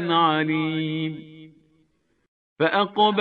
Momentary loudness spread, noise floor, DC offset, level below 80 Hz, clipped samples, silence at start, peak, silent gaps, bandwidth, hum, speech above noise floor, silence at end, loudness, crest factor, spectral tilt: 10 LU; -67 dBFS; under 0.1%; -72 dBFS; under 0.1%; 0 s; -6 dBFS; 2.28-2.56 s; 4.8 kHz; none; 45 dB; 0 s; -23 LUFS; 18 dB; -8 dB/octave